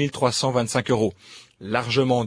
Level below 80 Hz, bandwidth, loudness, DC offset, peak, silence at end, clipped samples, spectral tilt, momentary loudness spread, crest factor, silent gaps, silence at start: -56 dBFS; 10.5 kHz; -23 LUFS; under 0.1%; -6 dBFS; 0 s; under 0.1%; -5 dB/octave; 6 LU; 18 dB; none; 0 s